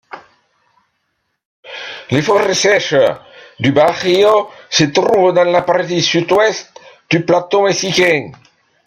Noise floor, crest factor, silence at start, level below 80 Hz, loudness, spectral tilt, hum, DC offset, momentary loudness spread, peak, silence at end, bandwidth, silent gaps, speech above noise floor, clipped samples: -68 dBFS; 14 dB; 0.15 s; -56 dBFS; -13 LUFS; -4 dB/octave; none; under 0.1%; 11 LU; 0 dBFS; 0.55 s; 15.5 kHz; 1.45-1.63 s; 56 dB; under 0.1%